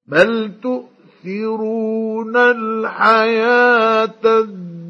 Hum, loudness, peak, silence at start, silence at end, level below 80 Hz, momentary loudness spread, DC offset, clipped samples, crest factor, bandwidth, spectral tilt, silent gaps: none; -15 LUFS; 0 dBFS; 0.1 s; 0 s; -64 dBFS; 12 LU; under 0.1%; under 0.1%; 16 dB; 8 kHz; -6 dB/octave; none